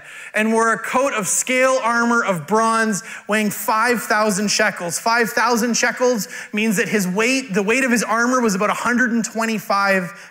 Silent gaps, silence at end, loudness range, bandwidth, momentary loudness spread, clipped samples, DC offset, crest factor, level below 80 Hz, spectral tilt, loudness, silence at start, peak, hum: none; 0 s; 1 LU; 16.5 kHz; 4 LU; under 0.1%; under 0.1%; 12 dB; -66 dBFS; -3.5 dB/octave; -18 LUFS; 0 s; -6 dBFS; none